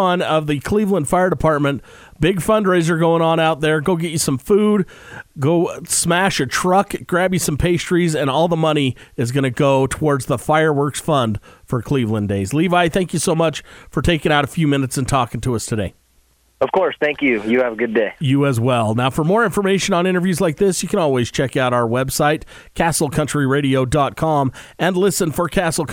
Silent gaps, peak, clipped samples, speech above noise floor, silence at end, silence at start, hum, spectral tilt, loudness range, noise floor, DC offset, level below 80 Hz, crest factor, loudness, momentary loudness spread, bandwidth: none; -2 dBFS; under 0.1%; 40 dB; 0 s; 0 s; none; -5 dB/octave; 2 LU; -57 dBFS; under 0.1%; -40 dBFS; 16 dB; -17 LUFS; 6 LU; 20 kHz